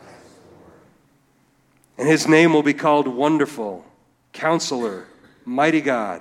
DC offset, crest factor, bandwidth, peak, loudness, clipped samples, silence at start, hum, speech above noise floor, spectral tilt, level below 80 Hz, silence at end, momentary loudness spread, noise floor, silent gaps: under 0.1%; 20 dB; 14 kHz; -2 dBFS; -19 LUFS; under 0.1%; 2 s; none; 42 dB; -5 dB/octave; -70 dBFS; 0 s; 17 LU; -60 dBFS; none